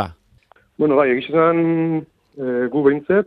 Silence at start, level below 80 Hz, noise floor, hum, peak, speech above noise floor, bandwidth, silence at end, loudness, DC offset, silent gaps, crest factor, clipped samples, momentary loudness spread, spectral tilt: 0 s; -58 dBFS; -54 dBFS; none; -2 dBFS; 38 dB; 5.2 kHz; 0 s; -18 LUFS; under 0.1%; none; 16 dB; under 0.1%; 10 LU; -9.5 dB/octave